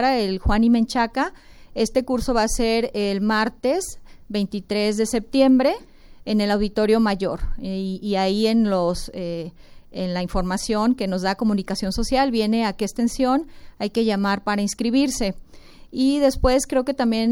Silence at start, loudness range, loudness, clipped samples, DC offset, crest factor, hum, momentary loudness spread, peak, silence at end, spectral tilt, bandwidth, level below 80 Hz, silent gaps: 0 s; 3 LU; -22 LUFS; under 0.1%; under 0.1%; 16 dB; none; 11 LU; -4 dBFS; 0 s; -5 dB/octave; 17 kHz; -36 dBFS; none